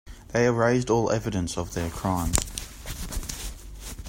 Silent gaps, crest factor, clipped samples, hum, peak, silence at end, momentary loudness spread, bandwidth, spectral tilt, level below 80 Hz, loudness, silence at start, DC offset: none; 26 dB; under 0.1%; none; 0 dBFS; 0 s; 15 LU; 16.5 kHz; -5 dB/octave; -38 dBFS; -27 LUFS; 0.05 s; under 0.1%